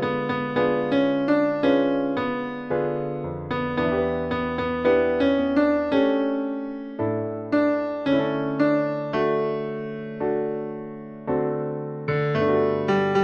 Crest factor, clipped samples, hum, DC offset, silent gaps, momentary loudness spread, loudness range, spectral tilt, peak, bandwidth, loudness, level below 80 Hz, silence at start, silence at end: 16 dB; under 0.1%; none; under 0.1%; none; 9 LU; 3 LU; -8 dB/octave; -8 dBFS; 6.8 kHz; -24 LUFS; -52 dBFS; 0 s; 0 s